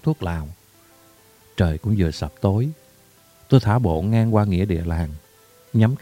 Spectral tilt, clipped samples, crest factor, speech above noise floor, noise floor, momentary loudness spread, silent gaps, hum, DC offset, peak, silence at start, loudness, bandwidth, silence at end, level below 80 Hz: -8.5 dB/octave; under 0.1%; 18 dB; 34 dB; -53 dBFS; 13 LU; none; none; under 0.1%; -4 dBFS; 0.05 s; -21 LUFS; 15.5 kHz; 0.05 s; -38 dBFS